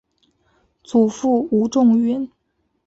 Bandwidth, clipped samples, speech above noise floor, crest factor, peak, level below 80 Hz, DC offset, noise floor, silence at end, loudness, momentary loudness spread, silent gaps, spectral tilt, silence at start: 8 kHz; under 0.1%; 53 dB; 14 dB; -6 dBFS; -60 dBFS; under 0.1%; -70 dBFS; 0.6 s; -18 LUFS; 8 LU; none; -7 dB/octave; 0.9 s